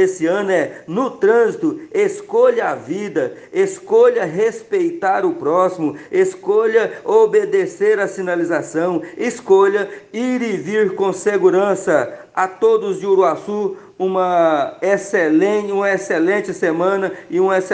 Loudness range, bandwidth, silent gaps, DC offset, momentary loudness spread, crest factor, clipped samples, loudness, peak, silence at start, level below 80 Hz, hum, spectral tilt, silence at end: 1 LU; 9.4 kHz; none; under 0.1%; 8 LU; 16 dB; under 0.1%; -17 LUFS; -2 dBFS; 0 s; -68 dBFS; none; -5.5 dB/octave; 0 s